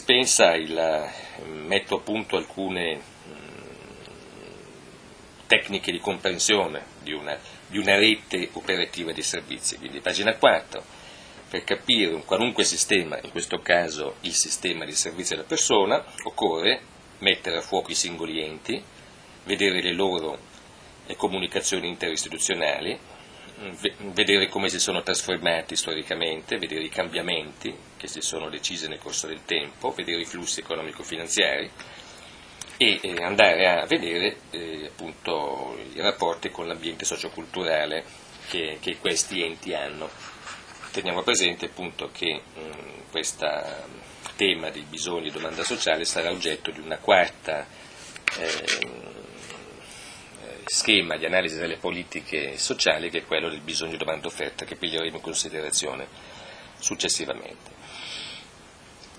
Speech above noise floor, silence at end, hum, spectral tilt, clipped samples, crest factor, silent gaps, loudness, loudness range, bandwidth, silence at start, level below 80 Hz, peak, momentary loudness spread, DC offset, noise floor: 23 dB; 0 s; none; -1.5 dB/octave; under 0.1%; 28 dB; none; -25 LUFS; 6 LU; 14 kHz; 0 s; -60 dBFS; 0 dBFS; 21 LU; under 0.1%; -49 dBFS